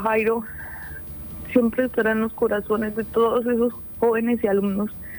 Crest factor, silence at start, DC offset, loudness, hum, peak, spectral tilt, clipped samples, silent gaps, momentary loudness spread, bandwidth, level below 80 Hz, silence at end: 18 dB; 0 s; under 0.1%; -23 LUFS; none; -6 dBFS; -8 dB/octave; under 0.1%; none; 12 LU; over 20 kHz; -48 dBFS; 0 s